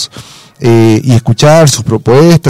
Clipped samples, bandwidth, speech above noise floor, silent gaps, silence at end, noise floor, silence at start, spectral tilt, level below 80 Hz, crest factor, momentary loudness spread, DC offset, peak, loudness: 0.3%; 16 kHz; 26 dB; none; 0 s; -31 dBFS; 0 s; -6 dB/octave; -38 dBFS; 6 dB; 7 LU; under 0.1%; 0 dBFS; -7 LUFS